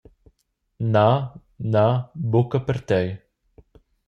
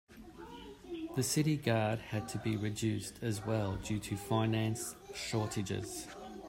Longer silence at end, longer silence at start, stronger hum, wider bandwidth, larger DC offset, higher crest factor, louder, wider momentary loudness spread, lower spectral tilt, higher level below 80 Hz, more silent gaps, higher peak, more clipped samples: first, 0.9 s vs 0 s; first, 0.8 s vs 0.1 s; neither; second, 6.8 kHz vs 16 kHz; neither; about the same, 18 dB vs 18 dB; first, -22 LUFS vs -36 LUFS; second, 12 LU vs 15 LU; first, -8.5 dB/octave vs -5 dB/octave; first, -54 dBFS vs -60 dBFS; neither; first, -4 dBFS vs -18 dBFS; neither